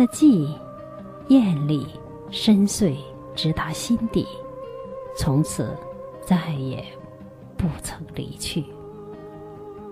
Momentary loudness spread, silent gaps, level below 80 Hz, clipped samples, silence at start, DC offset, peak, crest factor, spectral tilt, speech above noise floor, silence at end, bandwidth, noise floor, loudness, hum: 21 LU; none; -46 dBFS; under 0.1%; 0 s; under 0.1%; -6 dBFS; 18 dB; -6 dB/octave; 21 dB; 0 s; 15.5 kHz; -42 dBFS; -23 LUFS; none